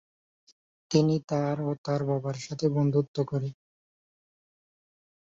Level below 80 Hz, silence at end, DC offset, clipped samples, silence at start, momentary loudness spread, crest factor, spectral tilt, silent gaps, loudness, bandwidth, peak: -68 dBFS; 1.7 s; under 0.1%; under 0.1%; 0.9 s; 7 LU; 20 dB; -7.5 dB/octave; 1.24-1.28 s, 1.78-1.84 s, 3.08-3.14 s; -28 LUFS; 7.8 kHz; -10 dBFS